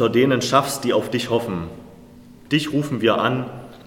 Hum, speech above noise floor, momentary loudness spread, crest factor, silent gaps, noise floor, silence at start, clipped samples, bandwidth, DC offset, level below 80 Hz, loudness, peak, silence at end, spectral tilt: none; 24 dB; 12 LU; 18 dB; none; -44 dBFS; 0 s; under 0.1%; 17.5 kHz; under 0.1%; -54 dBFS; -20 LUFS; -2 dBFS; 0.05 s; -5 dB/octave